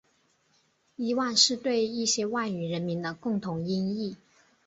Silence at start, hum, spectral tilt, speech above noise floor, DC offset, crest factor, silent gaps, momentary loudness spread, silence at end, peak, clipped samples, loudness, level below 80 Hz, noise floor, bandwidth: 1 s; none; -3.5 dB/octave; 41 dB; under 0.1%; 22 dB; none; 11 LU; 0.5 s; -8 dBFS; under 0.1%; -28 LUFS; -70 dBFS; -69 dBFS; 8.2 kHz